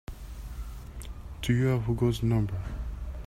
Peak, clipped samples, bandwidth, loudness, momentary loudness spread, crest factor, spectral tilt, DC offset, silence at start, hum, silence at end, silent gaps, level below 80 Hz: -14 dBFS; under 0.1%; 15 kHz; -29 LUFS; 17 LU; 16 dB; -7 dB/octave; under 0.1%; 0.1 s; none; 0 s; none; -40 dBFS